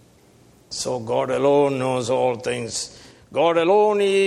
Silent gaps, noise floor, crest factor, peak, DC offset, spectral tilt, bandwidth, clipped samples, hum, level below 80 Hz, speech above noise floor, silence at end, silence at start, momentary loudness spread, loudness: none; -53 dBFS; 16 dB; -6 dBFS; under 0.1%; -4.5 dB/octave; 12.5 kHz; under 0.1%; none; -60 dBFS; 33 dB; 0 s; 0.7 s; 12 LU; -21 LUFS